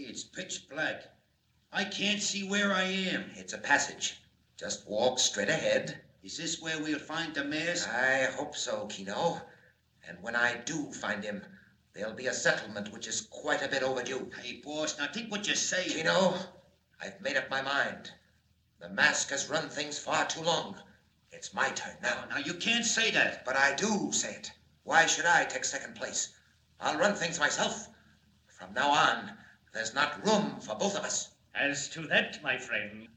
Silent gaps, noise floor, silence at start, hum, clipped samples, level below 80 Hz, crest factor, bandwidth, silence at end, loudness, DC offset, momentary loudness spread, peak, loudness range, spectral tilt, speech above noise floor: none; -71 dBFS; 0 s; none; under 0.1%; -74 dBFS; 24 dB; 14 kHz; 0.1 s; -31 LUFS; under 0.1%; 15 LU; -10 dBFS; 5 LU; -2 dB/octave; 39 dB